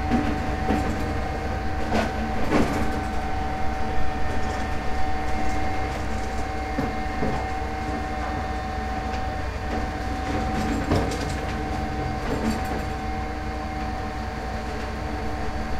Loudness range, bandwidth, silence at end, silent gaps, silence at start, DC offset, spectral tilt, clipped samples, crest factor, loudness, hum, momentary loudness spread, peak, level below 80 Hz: 3 LU; 14.5 kHz; 0 s; none; 0 s; under 0.1%; -6 dB/octave; under 0.1%; 18 dB; -28 LUFS; none; 6 LU; -6 dBFS; -32 dBFS